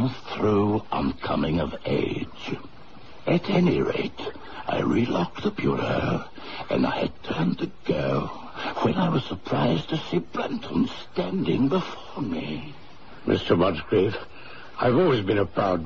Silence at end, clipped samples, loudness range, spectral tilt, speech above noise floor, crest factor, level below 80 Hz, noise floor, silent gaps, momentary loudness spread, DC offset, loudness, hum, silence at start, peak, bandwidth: 0 s; under 0.1%; 2 LU; -7.5 dB/octave; 22 dB; 18 dB; -48 dBFS; -47 dBFS; none; 13 LU; 1%; -26 LUFS; none; 0 s; -6 dBFS; 7.2 kHz